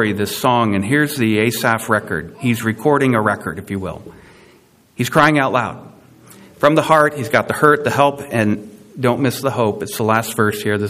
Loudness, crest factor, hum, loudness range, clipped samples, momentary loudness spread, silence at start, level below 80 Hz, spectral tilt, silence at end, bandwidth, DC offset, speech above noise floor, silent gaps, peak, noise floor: -17 LUFS; 18 dB; none; 4 LU; under 0.1%; 12 LU; 0 s; -54 dBFS; -5.5 dB/octave; 0 s; 16 kHz; under 0.1%; 34 dB; none; 0 dBFS; -50 dBFS